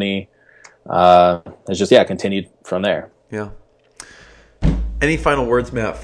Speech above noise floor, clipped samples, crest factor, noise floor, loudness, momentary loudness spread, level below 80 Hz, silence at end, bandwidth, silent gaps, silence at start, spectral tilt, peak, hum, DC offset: 32 dB; under 0.1%; 18 dB; -48 dBFS; -17 LUFS; 16 LU; -30 dBFS; 0 s; 10.5 kHz; none; 0 s; -5.5 dB/octave; 0 dBFS; none; under 0.1%